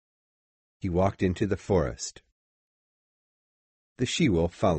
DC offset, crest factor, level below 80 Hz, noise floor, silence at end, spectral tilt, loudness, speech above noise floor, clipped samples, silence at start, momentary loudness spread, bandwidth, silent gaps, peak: under 0.1%; 18 dB; -46 dBFS; under -90 dBFS; 0 s; -5.5 dB/octave; -28 LUFS; over 64 dB; under 0.1%; 0.85 s; 12 LU; 8.4 kHz; 2.32-3.96 s; -12 dBFS